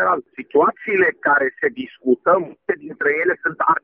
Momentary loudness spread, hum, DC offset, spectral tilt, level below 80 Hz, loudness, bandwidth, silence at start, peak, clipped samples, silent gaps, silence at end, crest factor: 8 LU; none; under 0.1%; -8.5 dB/octave; -62 dBFS; -19 LUFS; 3.6 kHz; 0 s; -4 dBFS; under 0.1%; none; 0.05 s; 16 dB